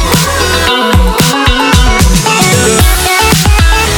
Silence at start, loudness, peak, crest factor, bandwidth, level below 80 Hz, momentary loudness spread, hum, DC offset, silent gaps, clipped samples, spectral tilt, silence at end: 0 s; -7 LUFS; 0 dBFS; 8 dB; over 20 kHz; -12 dBFS; 2 LU; none; under 0.1%; none; 0.3%; -3.5 dB/octave; 0 s